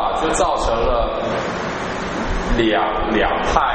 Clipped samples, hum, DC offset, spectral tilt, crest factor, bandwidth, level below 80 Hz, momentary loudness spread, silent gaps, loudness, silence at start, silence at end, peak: under 0.1%; none; under 0.1%; -4.5 dB/octave; 18 dB; 8.8 kHz; -28 dBFS; 6 LU; none; -19 LUFS; 0 s; 0 s; 0 dBFS